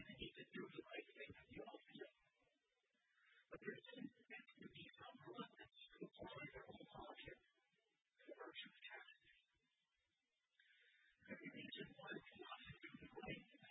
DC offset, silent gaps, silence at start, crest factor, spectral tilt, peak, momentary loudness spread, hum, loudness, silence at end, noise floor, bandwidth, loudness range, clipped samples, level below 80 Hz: under 0.1%; none; 0 s; 24 dB; -2 dB/octave; -38 dBFS; 6 LU; none; -58 LUFS; 0 s; under -90 dBFS; 3.8 kHz; 4 LU; under 0.1%; -80 dBFS